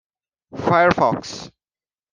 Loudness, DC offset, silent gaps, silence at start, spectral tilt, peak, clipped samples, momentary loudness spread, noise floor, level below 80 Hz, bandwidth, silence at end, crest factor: -18 LUFS; under 0.1%; none; 0.55 s; -5.5 dB/octave; -2 dBFS; under 0.1%; 19 LU; under -90 dBFS; -54 dBFS; 9.6 kHz; 0.65 s; 20 dB